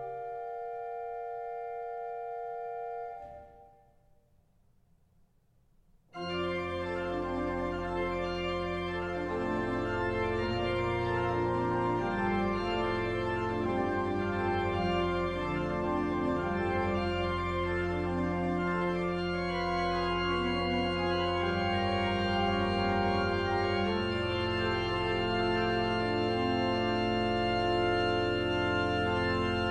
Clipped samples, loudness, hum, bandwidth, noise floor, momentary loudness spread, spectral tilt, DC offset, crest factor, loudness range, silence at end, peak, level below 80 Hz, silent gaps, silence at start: under 0.1%; -31 LUFS; none; 9.4 kHz; -67 dBFS; 10 LU; -7 dB/octave; under 0.1%; 16 dB; 11 LU; 0 s; -16 dBFS; -48 dBFS; none; 0 s